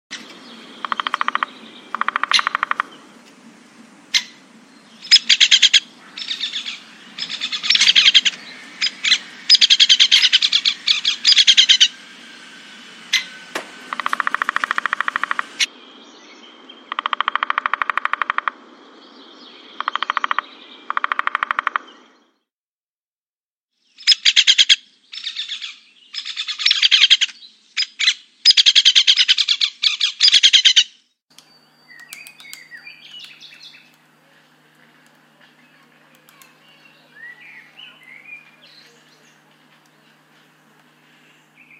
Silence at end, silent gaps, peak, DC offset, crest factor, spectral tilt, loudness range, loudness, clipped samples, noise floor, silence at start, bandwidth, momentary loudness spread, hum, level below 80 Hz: 3.45 s; 22.52-23.69 s, 31.23-31.28 s; 0 dBFS; under 0.1%; 20 dB; 3 dB/octave; 12 LU; -14 LUFS; under 0.1%; under -90 dBFS; 0.1 s; 16 kHz; 21 LU; none; -76 dBFS